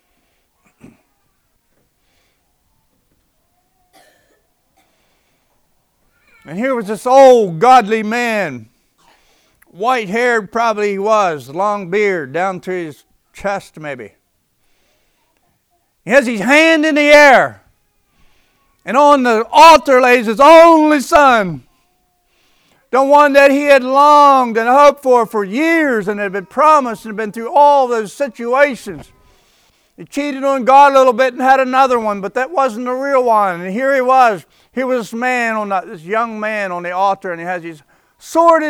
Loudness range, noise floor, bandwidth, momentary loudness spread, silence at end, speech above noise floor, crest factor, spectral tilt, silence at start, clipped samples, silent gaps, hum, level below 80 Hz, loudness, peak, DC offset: 10 LU; -62 dBFS; 17 kHz; 16 LU; 0 s; 51 dB; 14 dB; -4 dB/octave; 6.5 s; 0.3%; none; none; -52 dBFS; -12 LUFS; 0 dBFS; under 0.1%